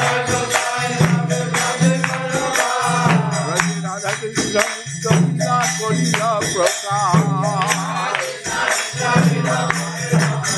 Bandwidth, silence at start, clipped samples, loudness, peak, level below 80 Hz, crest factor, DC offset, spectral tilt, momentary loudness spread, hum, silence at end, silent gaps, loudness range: 13 kHz; 0 s; under 0.1%; -18 LUFS; 0 dBFS; -52 dBFS; 18 dB; under 0.1%; -4 dB/octave; 5 LU; none; 0 s; none; 1 LU